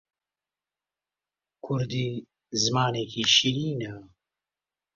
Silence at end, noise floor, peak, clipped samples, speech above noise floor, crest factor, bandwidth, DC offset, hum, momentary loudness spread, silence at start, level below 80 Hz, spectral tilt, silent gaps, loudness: 0.9 s; under -90 dBFS; -6 dBFS; under 0.1%; over 64 dB; 24 dB; 7.6 kHz; under 0.1%; 50 Hz at -65 dBFS; 16 LU; 1.65 s; -64 dBFS; -3.5 dB/octave; none; -25 LUFS